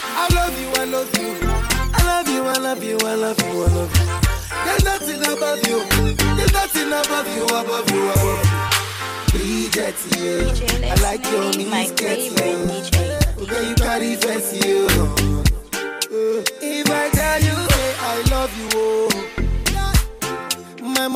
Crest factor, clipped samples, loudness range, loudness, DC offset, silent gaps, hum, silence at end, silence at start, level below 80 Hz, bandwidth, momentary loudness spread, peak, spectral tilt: 18 dB; under 0.1%; 1 LU; -19 LUFS; under 0.1%; none; none; 0 s; 0 s; -26 dBFS; 17 kHz; 5 LU; -2 dBFS; -4 dB/octave